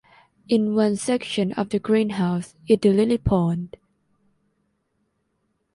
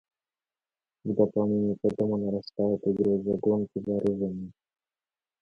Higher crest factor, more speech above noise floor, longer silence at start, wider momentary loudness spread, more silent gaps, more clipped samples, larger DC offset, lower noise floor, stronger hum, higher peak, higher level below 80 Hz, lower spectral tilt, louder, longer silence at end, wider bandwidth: about the same, 18 dB vs 18 dB; second, 51 dB vs over 63 dB; second, 0.5 s vs 1.05 s; about the same, 7 LU vs 7 LU; neither; neither; neither; second, -72 dBFS vs under -90 dBFS; neither; first, -6 dBFS vs -10 dBFS; first, -46 dBFS vs -62 dBFS; second, -6.5 dB/octave vs -10.5 dB/octave; first, -22 LUFS vs -28 LUFS; first, 2.1 s vs 0.9 s; first, 11.5 kHz vs 5.4 kHz